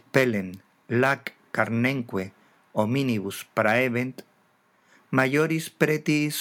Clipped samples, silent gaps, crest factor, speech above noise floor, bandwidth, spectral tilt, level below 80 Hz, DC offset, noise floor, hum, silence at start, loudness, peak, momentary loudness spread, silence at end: under 0.1%; none; 20 dB; 40 dB; 19.5 kHz; -5.5 dB/octave; -76 dBFS; under 0.1%; -64 dBFS; none; 0.15 s; -25 LUFS; -6 dBFS; 10 LU; 0 s